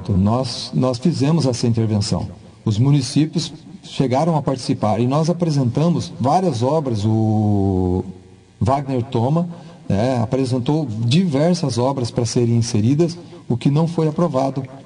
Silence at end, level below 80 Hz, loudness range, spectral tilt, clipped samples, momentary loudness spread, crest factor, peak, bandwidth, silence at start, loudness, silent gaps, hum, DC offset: 0.05 s; -52 dBFS; 2 LU; -7 dB/octave; under 0.1%; 6 LU; 14 dB; -4 dBFS; 10.5 kHz; 0 s; -19 LUFS; none; none; under 0.1%